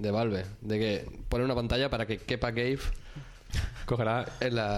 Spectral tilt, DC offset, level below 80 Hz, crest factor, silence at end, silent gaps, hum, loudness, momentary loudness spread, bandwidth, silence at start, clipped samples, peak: -6 dB/octave; under 0.1%; -40 dBFS; 16 dB; 0 s; none; none; -31 LUFS; 8 LU; 13.5 kHz; 0 s; under 0.1%; -14 dBFS